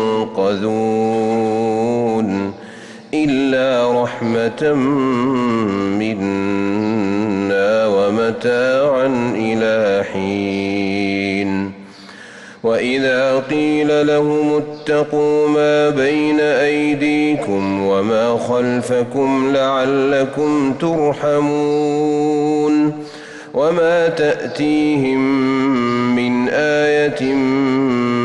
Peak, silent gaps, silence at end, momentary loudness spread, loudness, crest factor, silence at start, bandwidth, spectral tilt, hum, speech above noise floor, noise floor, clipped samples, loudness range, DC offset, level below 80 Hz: -6 dBFS; none; 0 s; 5 LU; -16 LUFS; 10 dB; 0 s; 11 kHz; -6 dB/octave; none; 22 dB; -37 dBFS; under 0.1%; 3 LU; under 0.1%; -54 dBFS